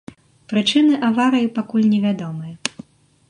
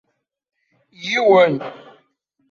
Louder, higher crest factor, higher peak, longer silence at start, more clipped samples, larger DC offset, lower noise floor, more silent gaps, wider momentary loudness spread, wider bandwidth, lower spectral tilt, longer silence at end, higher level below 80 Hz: about the same, -18 LUFS vs -16 LUFS; about the same, 18 dB vs 18 dB; about the same, -2 dBFS vs -2 dBFS; second, 0.5 s vs 1 s; neither; neither; second, -42 dBFS vs -66 dBFS; neither; second, 12 LU vs 18 LU; first, 10.5 kHz vs 7.2 kHz; about the same, -5 dB/octave vs -5 dB/octave; second, 0.6 s vs 0.75 s; about the same, -64 dBFS vs -68 dBFS